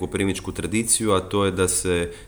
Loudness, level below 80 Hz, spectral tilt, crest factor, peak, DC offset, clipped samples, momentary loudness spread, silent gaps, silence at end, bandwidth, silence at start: -22 LUFS; -44 dBFS; -3.5 dB/octave; 16 dB; -6 dBFS; under 0.1%; under 0.1%; 6 LU; none; 0 s; over 20 kHz; 0 s